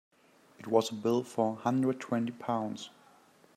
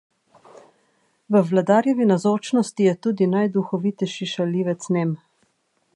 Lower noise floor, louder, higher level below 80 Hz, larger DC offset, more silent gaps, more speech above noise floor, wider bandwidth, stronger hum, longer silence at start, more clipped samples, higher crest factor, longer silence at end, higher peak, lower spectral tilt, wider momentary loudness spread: second, -61 dBFS vs -68 dBFS; second, -32 LUFS vs -21 LUFS; about the same, -78 dBFS vs -74 dBFS; neither; neither; second, 30 dB vs 48 dB; first, 14 kHz vs 11.5 kHz; neither; second, 0.6 s vs 1.3 s; neither; about the same, 22 dB vs 18 dB; about the same, 0.7 s vs 0.8 s; second, -12 dBFS vs -4 dBFS; about the same, -6 dB/octave vs -6.5 dB/octave; first, 12 LU vs 7 LU